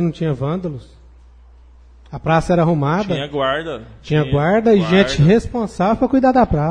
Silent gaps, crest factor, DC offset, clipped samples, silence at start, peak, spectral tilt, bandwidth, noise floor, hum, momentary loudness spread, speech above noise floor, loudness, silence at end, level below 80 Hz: none; 16 dB; under 0.1%; under 0.1%; 0 s; -2 dBFS; -7 dB/octave; 10 kHz; -44 dBFS; 60 Hz at -40 dBFS; 13 LU; 28 dB; -16 LUFS; 0 s; -36 dBFS